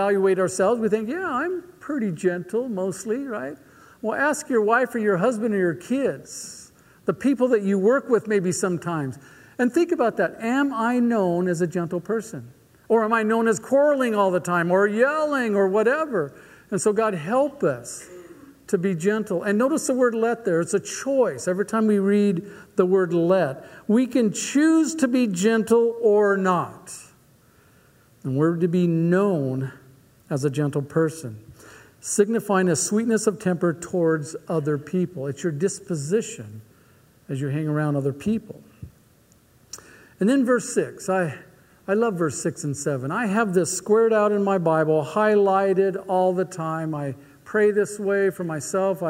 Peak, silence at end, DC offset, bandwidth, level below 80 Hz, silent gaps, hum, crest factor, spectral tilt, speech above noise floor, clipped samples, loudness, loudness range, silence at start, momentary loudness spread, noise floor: -6 dBFS; 0 s; under 0.1%; 16 kHz; -66 dBFS; none; none; 18 dB; -6 dB/octave; 35 dB; under 0.1%; -22 LUFS; 6 LU; 0 s; 11 LU; -57 dBFS